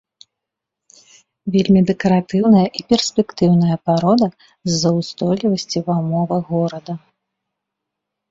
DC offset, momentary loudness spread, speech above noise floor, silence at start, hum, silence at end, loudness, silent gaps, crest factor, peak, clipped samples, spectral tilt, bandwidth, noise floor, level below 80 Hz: under 0.1%; 8 LU; 66 dB; 1.45 s; none; 1.3 s; -17 LUFS; none; 16 dB; -2 dBFS; under 0.1%; -6.5 dB/octave; 7.8 kHz; -82 dBFS; -52 dBFS